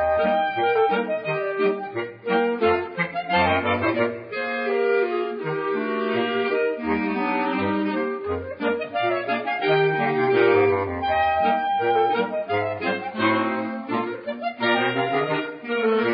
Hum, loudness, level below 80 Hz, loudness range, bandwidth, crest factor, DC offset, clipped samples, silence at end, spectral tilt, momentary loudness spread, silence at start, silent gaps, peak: none; -23 LUFS; -52 dBFS; 3 LU; 5.2 kHz; 14 dB; under 0.1%; under 0.1%; 0 s; -10 dB/octave; 7 LU; 0 s; none; -8 dBFS